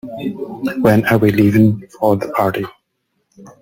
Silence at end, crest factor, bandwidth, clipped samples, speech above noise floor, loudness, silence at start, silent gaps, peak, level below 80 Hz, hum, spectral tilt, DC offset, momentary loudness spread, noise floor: 0.1 s; 16 dB; 17 kHz; under 0.1%; 55 dB; -15 LUFS; 0.05 s; none; 0 dBFS; -48 dBFS; none; -8 dB/octave; under 0.1%; 13 LU; -69 dBFS